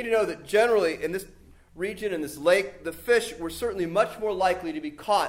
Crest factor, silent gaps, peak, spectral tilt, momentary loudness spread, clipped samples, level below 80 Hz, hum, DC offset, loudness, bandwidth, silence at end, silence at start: 18 dB; none; -8 dBFS; -4 dB/octave; 11 LU; under 0.1%; -54 dBFS; none; under 0.1%; -26 LUFS; 16 kHz; 0 s; 0 s